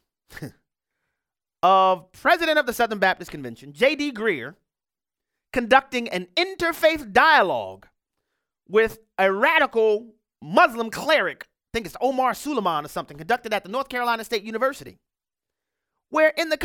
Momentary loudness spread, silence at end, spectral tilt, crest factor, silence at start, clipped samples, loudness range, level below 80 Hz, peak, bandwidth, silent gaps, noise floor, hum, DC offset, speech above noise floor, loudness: 14 LU; 0 s; -3.5 dB/octave; 22 dB; 0.3 s; under 0.1%; 5 LU; -56 dBFS; -2 dBFS; 18 kHz; none; under -90 dBFS; none; under 0.1%; over 68 dB; -22 LUFS